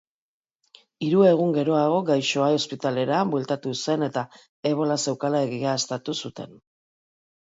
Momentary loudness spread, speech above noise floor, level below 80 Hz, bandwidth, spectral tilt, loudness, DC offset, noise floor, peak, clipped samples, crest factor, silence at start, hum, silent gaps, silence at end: 12 LU; over 67 dB; -72 dBFS; 8 kHz; -5 dB/octave; -24 LUFS; under 0.1%; under -90 dBFS; -6 dBFS; under 0.1%; 18 dB; 1 s; none; 4.49-4.63 s; 1.1 s